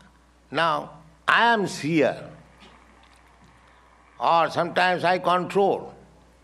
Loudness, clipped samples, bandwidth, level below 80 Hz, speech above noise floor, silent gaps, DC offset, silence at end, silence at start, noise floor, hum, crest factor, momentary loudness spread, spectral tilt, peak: -22 LUFS; under 0.1%; 13 kHz; -60 dBFS; 33 dB; none; under 0.1%; 0.5 s; 0.5 s; -55 dBFS; none; 20 dB; 12 LU; -5 dB/octave; -4 dBFS